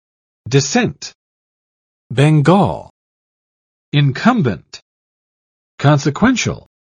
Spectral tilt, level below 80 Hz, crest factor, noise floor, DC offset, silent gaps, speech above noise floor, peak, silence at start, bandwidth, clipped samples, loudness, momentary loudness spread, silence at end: -6 dB/octave; -48 dBFS; 18 dB; under -90 dBFS; under 0.1%; 1.15-2.10 s, 2.90-3.92 s, 4.82-5.78 s; over 76 dB; 0 dBFS; 0.45 s; 9.8 kHz; under 0.1%; -15 LUFS; 12 LU; 0.25 s